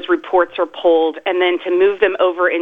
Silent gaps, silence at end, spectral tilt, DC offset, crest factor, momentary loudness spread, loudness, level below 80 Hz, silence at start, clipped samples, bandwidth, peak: none; 0 s; -5.5 dB/octave; under 0.1%; 14 dB; 3 LU; -16 LUFS; -56 dBFS; 0 s; under 0.1%; 3.9 kHz; -2 dBFS